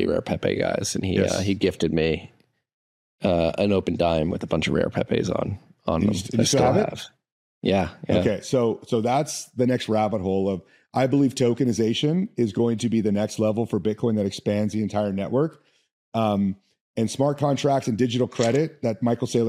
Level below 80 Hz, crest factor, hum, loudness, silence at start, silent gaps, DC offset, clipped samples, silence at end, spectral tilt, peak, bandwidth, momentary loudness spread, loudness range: -54 dBFS; 18 dB; none; -24 LUFS; 0 s; 2.74-3.18 s, 7.32-7.61 s, 15.93-16.12 s, 16.81-16.94 s; under 0.1%; under 0.1%; 0 s; -6 dB/octave; -6 dBFS; 14.5 kHz; 6 LU; 2 LU